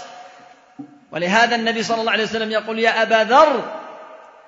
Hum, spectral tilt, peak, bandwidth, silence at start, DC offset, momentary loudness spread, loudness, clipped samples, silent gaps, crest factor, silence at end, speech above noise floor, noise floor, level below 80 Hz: none; -3.5 dB/octave; 0 dBFS; 7.8 kHz; 0 s; under 0.1%; 18 LU; -17 LUFS; under 0.1%; none; 18 dB; 0.3 s; 29 dB; -46 dBFS; -62 dBFS